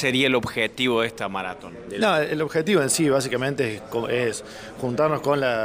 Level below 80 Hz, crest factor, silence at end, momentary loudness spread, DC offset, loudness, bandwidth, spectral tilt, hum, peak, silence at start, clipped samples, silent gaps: -56 dBFS; 16 dB; 0 s; 11 LU; under 0.1%; -23 LUFS; 16 kHz; -4 dB/octave; none; -6 dBFS; 0 s; under 0.1%; none